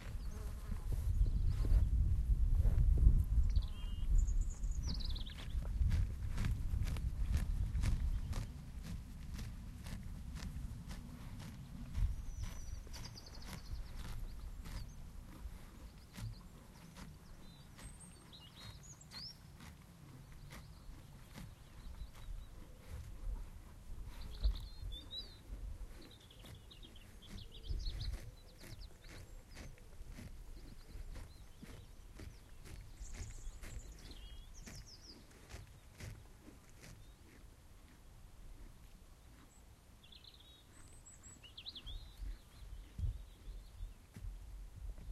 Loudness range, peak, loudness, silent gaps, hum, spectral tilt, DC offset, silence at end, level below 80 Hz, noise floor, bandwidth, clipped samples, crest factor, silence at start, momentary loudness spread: 19 LU; -16 dBFS; -44 LUFS; none; none; -5.5 dB/octave; under 0.1%; 0 s; -42 dBFS; -61 dBFS; 13.5 kHz; under 0.1%; 26 dB; 0 s; 20 LU